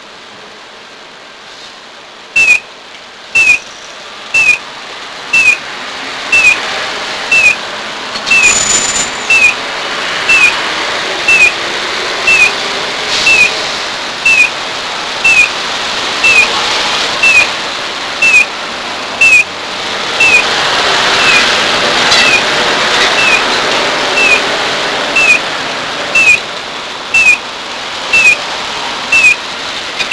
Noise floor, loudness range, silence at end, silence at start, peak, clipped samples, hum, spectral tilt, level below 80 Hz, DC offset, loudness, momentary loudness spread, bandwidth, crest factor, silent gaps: -32 dBFS; 3 LU; 0 s; 0 s; 0 dBFS; 0.5%; none; 0 dB/octave; -44 dBFS; under 0.1%; -8 LUFS; 12 LU; 11 kHz; 12 dB; none